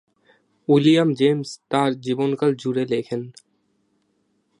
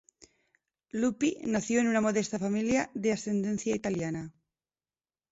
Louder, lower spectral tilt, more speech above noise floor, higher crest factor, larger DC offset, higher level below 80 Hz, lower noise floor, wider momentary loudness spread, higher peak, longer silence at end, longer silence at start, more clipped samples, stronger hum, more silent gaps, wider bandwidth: first, -21 LUFS vs -30 LUFS; first, -6.5 dB/octave vs -5 dB/octave; second, 48 dB vs over 61 dB; about the same, 18 dB vs 16 dB; neither; second, -70 dBFS vs -64 dBFS; second, -68 dBFS vs under -90 dBFS; first, 14 LU vs 8 LU; first, -4 dBFS vs -14 dBFS; first, 1.3 s vs 1 s; second, 0.7 s vs 0.95 s; neither; neither; neither; first, 11 kHz vs 8 kHz